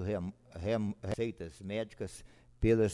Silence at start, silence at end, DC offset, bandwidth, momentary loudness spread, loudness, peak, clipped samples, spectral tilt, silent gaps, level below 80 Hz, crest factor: 0 s; 0 s; under 0.1%; 12 kHz; 13 LU; -36 LUFS; -16 dBFS; under 0.1%; -7 dB/octave; none; -50 dBFS; 18 dB